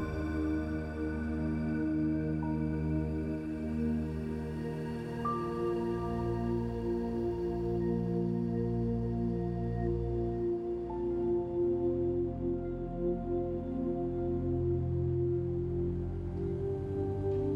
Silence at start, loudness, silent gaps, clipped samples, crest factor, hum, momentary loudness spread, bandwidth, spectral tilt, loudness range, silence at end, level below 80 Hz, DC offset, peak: 0 s; -34 LUFS; none; under 0.1%; 12 dB; none; 5 LU; 6 kHz; -10 dB/octave; 2 LU; 0 s; -44 dBFS; under 0.1%; -20 dBFS